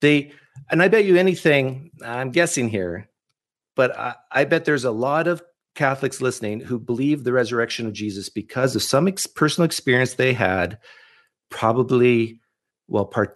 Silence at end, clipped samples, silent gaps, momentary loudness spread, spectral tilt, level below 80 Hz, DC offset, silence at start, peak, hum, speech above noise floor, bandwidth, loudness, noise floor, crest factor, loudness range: 0.05 s; under 0.1%; none; 12 LU; -5 dB/octave; -62 dBFS; under 0.1%; 0 s; -2 dBFS; none; 60 dB; 12 kHz; -21 LUFS; -80 dBFS; 18 dB; 3 LU